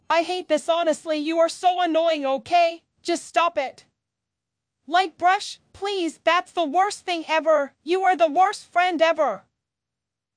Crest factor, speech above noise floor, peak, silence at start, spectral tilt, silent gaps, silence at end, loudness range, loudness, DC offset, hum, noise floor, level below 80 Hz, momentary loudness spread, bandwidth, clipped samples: 16 dB; 64 dB; -6 dBFS; 0.1 s; -2 dB/octave; none; 1 s; 4 LU; -22 LUFS; under 0.1%; none; -86 dBFS; -72 dBFS; 8 LU; 10.5 kHz; under 0.1%